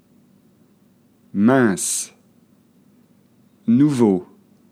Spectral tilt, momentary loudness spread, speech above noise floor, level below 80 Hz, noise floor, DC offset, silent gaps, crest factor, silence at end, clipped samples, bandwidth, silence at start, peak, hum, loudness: -5.5 dB/octave; 14 LU; 40 dB; -72 dBFS; -56 dBFS; under 0.1%; none; 18 dB; 0.45 s; under 0.1%; 15.5 kHz; 1.35 s; -2 dBFS; none; -18 LUFS